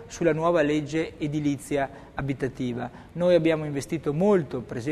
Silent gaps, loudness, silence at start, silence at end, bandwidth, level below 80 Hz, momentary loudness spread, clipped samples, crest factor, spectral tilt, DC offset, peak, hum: none; -26 LUFS; 0 s; 0 s; 13.5 kHz; -52 dBFS; 10 LU; under 0.1%; 18 dB; -6.5 dB/octave; under 0.1%; -8 dBFS; none